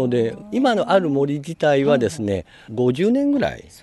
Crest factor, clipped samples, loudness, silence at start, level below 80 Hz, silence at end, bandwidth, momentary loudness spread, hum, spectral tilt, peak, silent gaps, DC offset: 16 dB; under 0.1%; -20 LUFS; 0 s; -52 dBFS; 0.2 s; 12 kHz; 8 LU; none; -6.5 dB/octave; -4 dBFS; none; under 0.1%